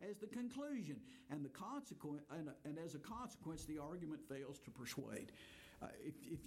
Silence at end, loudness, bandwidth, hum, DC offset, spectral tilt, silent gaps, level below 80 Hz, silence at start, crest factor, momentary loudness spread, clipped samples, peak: 0 s; -51 LUFS; 16.5 kHz; none; under 0.1%; -5.5 dB/octave; none; -72 dBFS; 0 s; 16 dB; 7 LU; under 0.1%; -34 dBFS